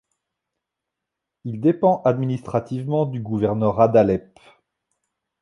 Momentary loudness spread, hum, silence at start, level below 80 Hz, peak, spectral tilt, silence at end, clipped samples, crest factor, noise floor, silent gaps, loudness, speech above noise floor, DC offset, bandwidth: 9 LU; none; 1.45 s; -54 dBFS; -2 dBFS; -9.5 dB/octave; 1.2 s; under 0.1%; 20 dB; -84 dBFS; none; -20 LUFS; 64 dB; under 0.1%; 10.5 kHz